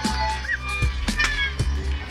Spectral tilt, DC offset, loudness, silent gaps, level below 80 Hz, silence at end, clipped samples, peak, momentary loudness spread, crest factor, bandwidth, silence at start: -4 dB/octave; under 0.1%; -24 LUFS; none; -28 dBFS; 0 s; under 0.1%; -8 dBFS; 4 LU; 16 dB; 12.5 kHz; 0 s